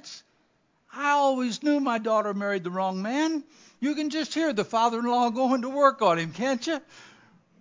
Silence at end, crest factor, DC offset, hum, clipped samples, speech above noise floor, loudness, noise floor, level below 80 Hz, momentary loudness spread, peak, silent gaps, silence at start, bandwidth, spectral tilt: 0.55 s; 20 dB; under 0.1%; none; under 0.1%; 43 dB; -26 LUFS; -68 dBFS; -82 dBFS; 9 LU; -6 dBFS; none; 0.05 s; 7.6 kHz; -4.5 dB/octave